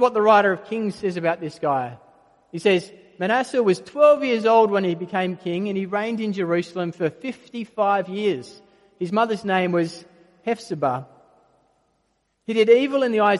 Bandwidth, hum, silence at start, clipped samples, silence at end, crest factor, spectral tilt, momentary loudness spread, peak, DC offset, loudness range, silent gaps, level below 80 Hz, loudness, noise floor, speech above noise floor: 11.5 kHz; none; 0 s; under 0.1%; 0 s; 20 dB; -6 dB/octave; 15 LU; -2 dBFS; under 0.1%; 5 LU; none; -70 dBFS; -21 LUFS; -70 dBFS; 49 dB